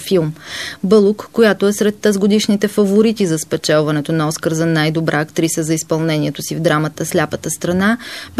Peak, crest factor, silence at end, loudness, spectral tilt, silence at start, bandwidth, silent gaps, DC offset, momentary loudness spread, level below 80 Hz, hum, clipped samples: -2 dBFS; 14 dB; 0 s; -16 LUFS; -5 dB/octave; 0 s; 14 kHz; none; 0.2%; 6 LU; -52 dBFS; none; under 0.1%